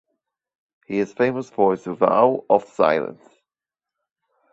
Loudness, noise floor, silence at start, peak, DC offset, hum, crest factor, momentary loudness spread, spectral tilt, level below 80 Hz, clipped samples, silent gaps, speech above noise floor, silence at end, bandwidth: -20 LUFS; -90 dBFS; 0.9 s; -2 dBFS; under 0.1%; none; 20 dB; 9 LU; -7 dB/octave; -66 dBFS; under 0.1%; none; 70 dB; 1.4 s; 8 kHz